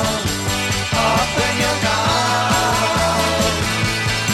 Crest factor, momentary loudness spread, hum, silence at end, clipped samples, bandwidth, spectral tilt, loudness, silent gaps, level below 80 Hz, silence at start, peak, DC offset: 14 dB; 3 LU; none; 0 s; under 0.1%; 16.5 kHz; -3.5 dB/octave; -17 LUFS; none; -34 dBFS; 0 s; -4 dBFS; under 0.1%